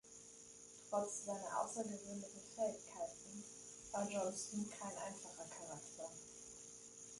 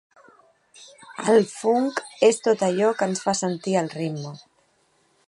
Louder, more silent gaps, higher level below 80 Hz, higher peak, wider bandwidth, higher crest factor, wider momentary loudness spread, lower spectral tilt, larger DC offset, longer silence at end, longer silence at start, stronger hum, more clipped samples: second, -47 LUFS vs -22 LUFS; neither; second, -80 dBFS vs -72 dBFS; second, -26 dBFS vs -4 dBFS; about the same, 11.5 kHz vs 11.5 kHz; about the same, 22 dB vs 20 dB; about the same, 12 LU vs 10 LU; about the same, -3.5 dB/octave vs -4.5 dB/octave; neither; second, 0 s vs 0.9 s; second, 0.05 s vs 0.8 s; neither; neither